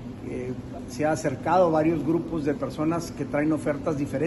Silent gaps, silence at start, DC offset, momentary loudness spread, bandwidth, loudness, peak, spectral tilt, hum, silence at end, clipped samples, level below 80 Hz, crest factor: none; 0 s; under 0.1%; 12 LU; 12 kHz; -26 LUFS; -10 dBFS; -7 dB/octave; none; 0 s; under 0.1%; -50 dBFS; 16 dB